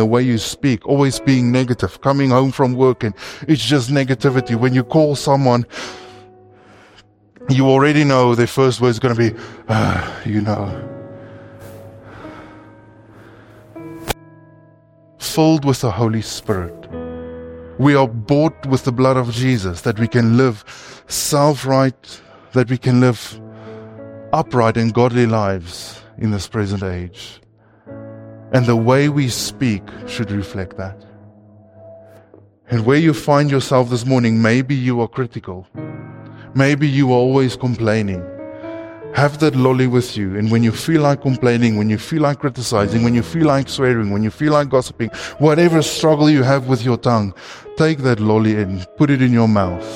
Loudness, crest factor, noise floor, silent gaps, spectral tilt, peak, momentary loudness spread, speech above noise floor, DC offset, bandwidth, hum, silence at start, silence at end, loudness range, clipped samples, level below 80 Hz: -16 LUFS; 16 dB; -49 dBFS; none; -6.5 dB/octave; -2 dBFS; 18 LU; 34 dB; under 0.1%; 16 kHz; none; 0 s; 0 s; 7 LU; under 0.1%; -46 dBFS